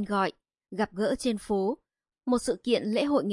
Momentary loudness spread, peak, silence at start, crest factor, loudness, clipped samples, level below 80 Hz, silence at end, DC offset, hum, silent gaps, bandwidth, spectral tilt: 8 LU; -12 dBFS; 0 s; 18 dB; -29 LUFS; under 0.1%; -58 dBFS; 0 s; under 0.1%; none; none; 11.5 kHz; -5 dB/octave